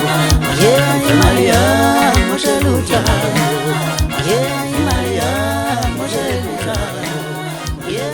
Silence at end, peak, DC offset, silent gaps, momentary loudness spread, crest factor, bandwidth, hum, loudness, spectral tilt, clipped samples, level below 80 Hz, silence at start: 0 s; 0 dBFS; under 0.1%; none; 10 LU; 14 dB; 19.5 kHz; none; -15 LUFS; -4.5 dB/octave; under 0.1%; -26 dBFS; 0 s